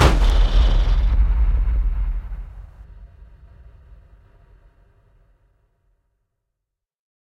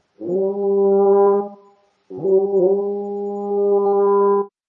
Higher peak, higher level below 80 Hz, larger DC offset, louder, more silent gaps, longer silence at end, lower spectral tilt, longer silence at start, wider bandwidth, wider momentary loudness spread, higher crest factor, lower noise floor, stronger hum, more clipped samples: first, 0 dBFS vs -6 dBFS; first, -22 dBFS vs -76 dBFS; neither; second, -21 LUFS vs -18 LUFS; neither; first, 4.15 s vs 0.2 s; second, -6 dB/octave vs -12 dB/octave; second, 0 s vs 0.2 s; first, 9.4 kHz vs 1.7 kHz; first, 20 LU vs 11 LU; first, 20 dB vs 12 dB; first, -83 dBFS vs -54 dBFS; neither; neither